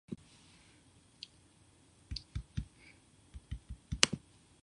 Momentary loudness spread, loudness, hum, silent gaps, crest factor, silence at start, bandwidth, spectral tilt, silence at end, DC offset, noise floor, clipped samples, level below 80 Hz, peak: 29 LU; -37 LUFS; none; none; 42 dB; 0.1 s; 11 kHz; -2 dB/octave; 0.45 s; under 0.1%; -65 dBFS; under 0.1%; -52 dBFS; -2 dBFS